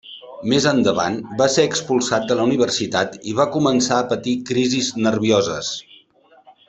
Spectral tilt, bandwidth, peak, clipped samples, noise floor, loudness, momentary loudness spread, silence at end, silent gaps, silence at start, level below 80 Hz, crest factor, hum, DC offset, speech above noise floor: -4 dB/octave; 8.4 kHz; -2 dBFS; under 0.1%; -53 dBFS; -19 LUFS; 6 LU; 0.15 s; none; 0.05 s; -56 dBFS; 18 dB; none; under 0.1%; 34 dB